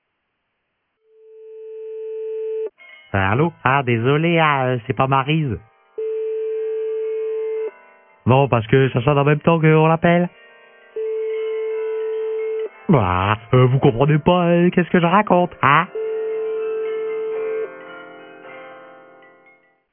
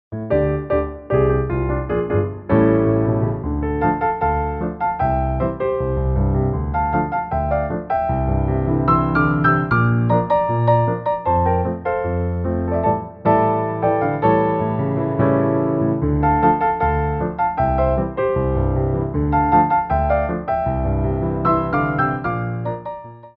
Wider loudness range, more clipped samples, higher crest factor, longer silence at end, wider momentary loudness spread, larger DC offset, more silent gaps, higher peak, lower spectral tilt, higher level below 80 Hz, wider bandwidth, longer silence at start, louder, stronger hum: first, 9 LU vs 3 LU; neither; about the same, 18 dB vs 16 dB; first, 1 s vs 0.1 s; first, 16 LU vs 6 LU; neither; neither; about the same, 0 dBFS vs -2 dBFS; about the same, -11.5 dB/octave vs -12 dB/octave; second, -50 dBFS vs -30 dBFS; second, 3.6 kHz vs 5 kHz; first, 1.35 s vs 0.1 s; about the same, -19 LUFS vs -19 LUFS; neither